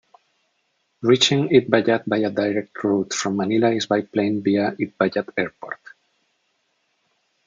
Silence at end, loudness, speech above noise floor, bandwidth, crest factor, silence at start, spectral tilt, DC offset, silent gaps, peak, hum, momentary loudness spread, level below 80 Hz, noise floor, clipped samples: 1.7 s; -20 LUFS; 50 dB; 9.4 kHz; 22 dB; 1 s; -4.5 dB/octave; under 0.1%; none; 0 dBFS; none; 10 LU; -66 dBFS; -70 dBFS; under 0.1%